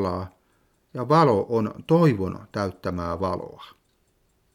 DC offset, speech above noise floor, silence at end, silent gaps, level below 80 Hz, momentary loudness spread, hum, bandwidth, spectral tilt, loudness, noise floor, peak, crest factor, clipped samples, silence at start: under 0.1%; 43 dB; 0.85 s; none; -54 dBFS; 15 LU; none; 15 kHz; -8 dB/octave; -24 LUFS; -67 dBFS; -6 dBFS; 18 dB; under 0.1%; 0 s